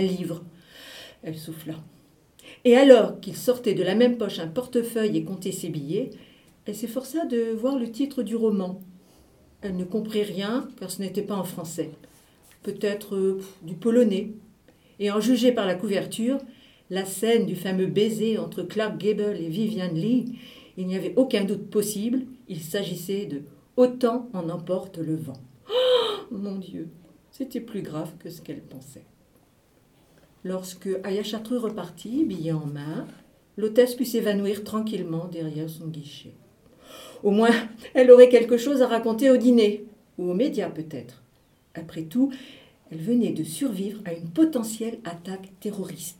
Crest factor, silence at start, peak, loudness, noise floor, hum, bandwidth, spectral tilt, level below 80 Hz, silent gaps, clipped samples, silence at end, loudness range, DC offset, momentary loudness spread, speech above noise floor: 24 dB; 0 s; 0 dBFS; -24 LUFS; -61 dBFS; none; 17.5 kHz; -5.5 dB/octave; -66 dBFS; none; under 0.1%; 0.05 s; 12 LU; under 0.1%; 17 LU; 37 dB